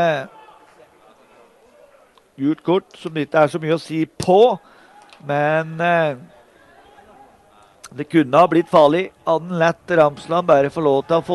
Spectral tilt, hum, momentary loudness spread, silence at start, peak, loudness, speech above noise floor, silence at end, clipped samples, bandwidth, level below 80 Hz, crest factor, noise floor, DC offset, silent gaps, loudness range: -6.5 dB/octave; none; 12 LU; 0 s; -2 dBFS; -18 LUFS; 35 dB; 0 s; under 0.1%; 12 kHz; -60 dBFS; 18 dB; -52 dBFS; under 0.1%; none; 7 LU